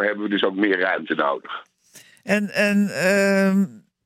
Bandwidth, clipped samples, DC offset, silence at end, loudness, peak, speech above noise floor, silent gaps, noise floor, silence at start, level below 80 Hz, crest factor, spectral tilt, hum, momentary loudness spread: 15 kHz; under 0.1%; under 0.1%; 0.25 s; -20 LUFS; -6 dBFS; 30 dB; none; -51 dBFS; 0 s; -72 dBFS; 16 dB; -5.5 dB/octave; none; 11 LU